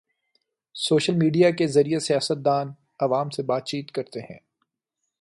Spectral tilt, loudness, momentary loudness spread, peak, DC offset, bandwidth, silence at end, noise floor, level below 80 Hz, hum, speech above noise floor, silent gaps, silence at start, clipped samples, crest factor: -5.5 dB/octave; -23 LUFS; 17 LU; -6 dBFS; under 0.1%; 11.5 kHz; 0.85 s; -81 dBFS; -68 dBFS; none; 59 dB; none; 0.75 s; under 0.1%; 18 dB